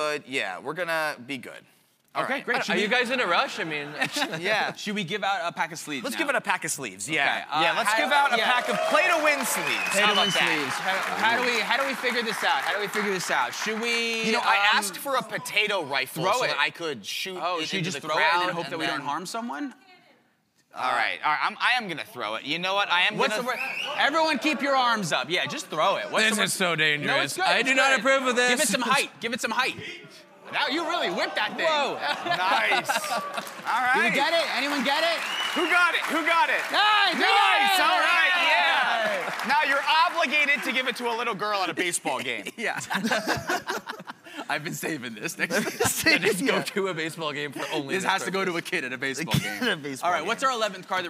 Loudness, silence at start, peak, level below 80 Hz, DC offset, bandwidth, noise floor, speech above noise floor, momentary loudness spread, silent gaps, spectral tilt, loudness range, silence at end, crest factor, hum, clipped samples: -24 LUFS; 0 s; -6 dBFS; -68 dBFS; under 0.1%; 16 kHz; -67 dBFS; 41 dB; 10 LU; none; -2.5 dB/octave; 7 LU; 0 s; 20 dB; none; under 0.1%